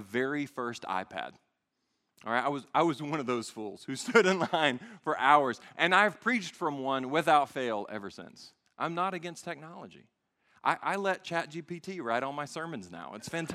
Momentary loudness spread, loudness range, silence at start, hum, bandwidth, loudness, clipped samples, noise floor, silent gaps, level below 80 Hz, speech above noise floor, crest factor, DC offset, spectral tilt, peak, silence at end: 17 LU; 8 LU; 0 s; none; 14.5 kHz; -30 LUFS; under 0.1%; -81 dBFS; none; -80 dBFS; 50 dB; 24 dB; under 0.1%; -4.5 dB/octave; -8 dBFS; 0 s